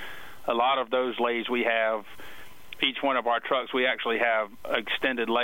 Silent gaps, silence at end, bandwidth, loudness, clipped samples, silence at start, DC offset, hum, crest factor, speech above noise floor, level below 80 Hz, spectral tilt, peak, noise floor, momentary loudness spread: none; 0 s; 16 kHz; -26 LUFS; under 0.1%; 0 s; 0.4%; none; 18 dB; 21 dB; -64 dBFS; -4 dB/octave; -10 dBFS; -47 dBFS; 13 LU